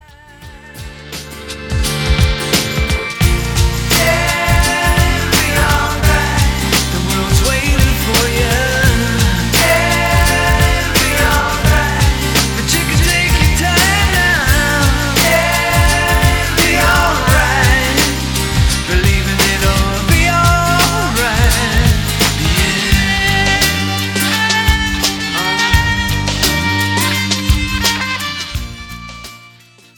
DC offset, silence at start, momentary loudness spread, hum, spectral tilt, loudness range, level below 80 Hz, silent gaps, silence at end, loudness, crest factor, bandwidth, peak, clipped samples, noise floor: under 0.1%; 0.4 s; 5 LU; none; -3.5 dB/octave; 3 LU; -20 dBFS; none; 0.5 s; -12 LUFS; 14 dB; 19.5 kHz; 0 dBFS; under 0.1%; -43 dBFS